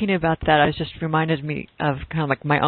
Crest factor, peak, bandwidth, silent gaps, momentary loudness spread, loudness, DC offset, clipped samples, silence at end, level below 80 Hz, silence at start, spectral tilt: 18 dB; -4 dBFS; 4.5 kHz; none; 8 LU; -22 LUFS; under 0.1%; under 0.1%; 0 s; -44 dBFS; 0 s; -11.5 dB/octave